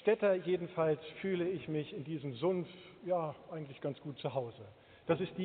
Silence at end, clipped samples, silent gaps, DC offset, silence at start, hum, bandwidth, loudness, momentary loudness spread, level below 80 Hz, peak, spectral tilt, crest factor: 0 s; under 0.1%; none; under 0.1%; 0 s; none; 4.6 kHz; -37 LUFS; 14 LU; -74 dBFS; -18 dBFS; -6 dB/octave; 18 dB